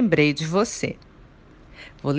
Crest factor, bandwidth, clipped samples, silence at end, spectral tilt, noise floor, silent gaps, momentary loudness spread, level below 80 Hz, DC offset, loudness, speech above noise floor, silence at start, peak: 20 dB; 10 kHz; under 0.1%; 0 s; -5.5 dB/octave; -49 dBFS; none; 24 LU; -52 dBFS; under 0.1%; -23 LUFS; 26 dB; 0 s; -4 dBFS